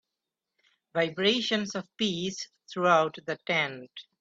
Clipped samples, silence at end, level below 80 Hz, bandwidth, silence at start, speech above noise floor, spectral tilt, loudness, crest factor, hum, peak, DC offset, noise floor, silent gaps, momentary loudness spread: under 0.1%; 0.2 s; -72 dBFS; 8 kHz; 0.95 s; 58 dB; -4 dB/octave; -28 LUFS; 20 dB; none; -10 dBFS; under 0.1%; -87 dBFS; none; 14 LU